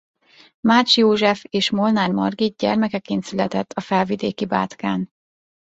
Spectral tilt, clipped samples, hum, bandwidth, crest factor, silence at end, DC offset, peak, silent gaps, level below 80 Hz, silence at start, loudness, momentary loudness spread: -5 dB/octave; under 0.1%; none; 8 kHz; 18 dB; 0.7 s; under 0.1%; -2 dBFS; none; -60 dBFS; 0.65 s; -20 LUFS; 10 LU